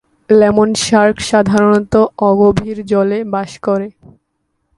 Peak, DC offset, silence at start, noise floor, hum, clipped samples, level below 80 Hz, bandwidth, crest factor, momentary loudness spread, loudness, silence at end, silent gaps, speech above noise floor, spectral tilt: 0 dBFS; under 0.1%; 0.3 s; -68 dBFS; none; under 0.1%; -42 dBFS; 11.5 kHz; 12 dB; 9 LU; -13 LUFS; 0.9 s; none; 55 dB; -5.5 dB/octave